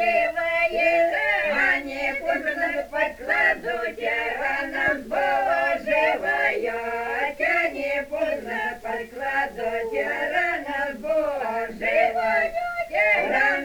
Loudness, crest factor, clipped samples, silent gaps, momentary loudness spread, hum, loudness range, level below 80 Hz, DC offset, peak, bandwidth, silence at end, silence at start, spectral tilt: -23 LUFS; 16 dB; under 0.1%; none; 7 LU; none; 4 LU; -52 dBFS; under 0.1%; -8 dBFS; over 20 kHz; 0 s; 0 s; -3.5 dB/octave